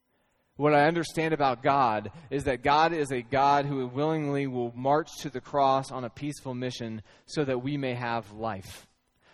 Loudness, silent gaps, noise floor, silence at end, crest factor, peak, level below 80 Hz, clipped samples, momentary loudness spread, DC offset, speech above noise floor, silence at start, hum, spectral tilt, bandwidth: -28 LUFS; none; -72 dBFS; 0.55 s; 20 dB; -8 dBFS; -58 dBFS; under 0.1%; 13 LU; under 0.1%; 44 dB; 0.6 s; none; -6 dB/octave; 13.5 kHz